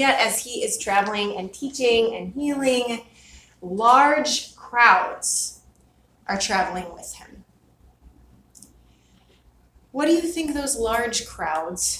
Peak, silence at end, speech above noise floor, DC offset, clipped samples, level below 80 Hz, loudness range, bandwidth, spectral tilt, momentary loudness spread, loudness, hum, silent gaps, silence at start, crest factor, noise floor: -2 dBFS; 0 s; 37 dB; under 0.1%; under 0.1%; -52 dBFS; 10 LU; 16 kHz; -2 dB/octave; 17 LU; -21 LUFS; none; none; 0 s; 22 dB; -58 dBFS